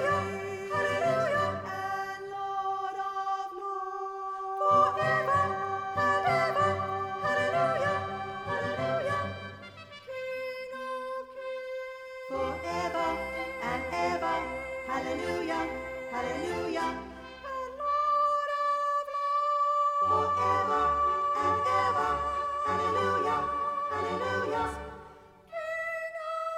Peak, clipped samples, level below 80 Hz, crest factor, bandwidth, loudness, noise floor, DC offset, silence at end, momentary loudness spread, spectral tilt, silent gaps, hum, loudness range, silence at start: -14 dBFS; under 0.1%; -56 dBFS; 16 dB; 14.5 kHz; -30 LUFS; -52 dBFS; under 0.1%; 0 s; 11 LU; -5 dB/octave; none; none; 7 LU; 0 s